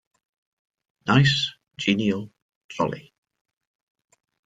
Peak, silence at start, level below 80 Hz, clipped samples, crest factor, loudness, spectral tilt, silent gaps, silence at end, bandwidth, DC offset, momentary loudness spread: -4 dBFS; 1.05 s; -58 dBFS; under 0.1%; 24 dB; -23 LUFS; -5.5 dB/octave; 2.42-2.49 s, 2.55-2.69 s; 1.45 s; 7.8 kHz; under 0.1%; 20 LU